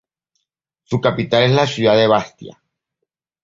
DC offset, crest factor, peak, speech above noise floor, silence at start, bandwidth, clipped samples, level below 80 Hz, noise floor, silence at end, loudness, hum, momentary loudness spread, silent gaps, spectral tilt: under 0.1%; 18 dB; -2 dBFS; 63 dB; 0.9 s; 7.6 kHz; under 0.1%; -54 dBFS; -78 dBFS; 0.95 s; -16 LUFS; none; 8 LU; none; -6 dB/octave